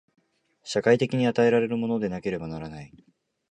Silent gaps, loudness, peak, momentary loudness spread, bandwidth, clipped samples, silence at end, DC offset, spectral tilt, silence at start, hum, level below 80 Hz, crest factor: none; -25 LUFS; -6 dBFS; 17 LU; 9.4 kHz; under 0.1%; 0.65 s; under 0.1%; -6.5 dB/octave; 0.65 s; none; -58 dBFS; 20 dB